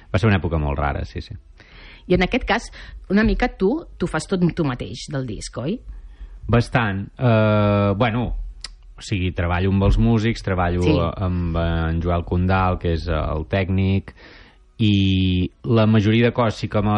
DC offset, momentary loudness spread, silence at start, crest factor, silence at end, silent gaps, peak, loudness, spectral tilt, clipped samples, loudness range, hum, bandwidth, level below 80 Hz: under 0.1%; 12 LU; 0.1 s; 14 dB; 0 s; none; -6 dBFS; -20 LUFS; -7 dB/octave; under 0.1%; 3 LU; none; 10.5 kHz; -32 dBFS